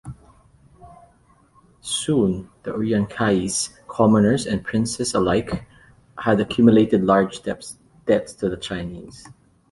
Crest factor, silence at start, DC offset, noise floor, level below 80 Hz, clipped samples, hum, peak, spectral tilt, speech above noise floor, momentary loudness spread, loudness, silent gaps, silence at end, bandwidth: 20 dB; 0.05 s; under 0.1%; -56 dBFS; -48 dBFS; under 0.1%; none; -2 dBFS; -5.5 dB/octave; 36 dB; 16 LU; -21 LUFS; none; 0.45 s; 11.5 kHz